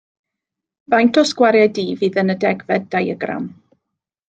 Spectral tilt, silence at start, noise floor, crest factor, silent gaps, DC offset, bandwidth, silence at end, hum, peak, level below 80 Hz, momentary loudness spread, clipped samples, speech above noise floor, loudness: -5.5 dB/octave; 0.9 s; -83 dBFS; 16 dB; none; under 0.1%; 9.2 kHz; 0.75 s; none; -2 dBFS; -66 dBFS; 11 LU; under 0.1%; 66 dB; -17 LUFS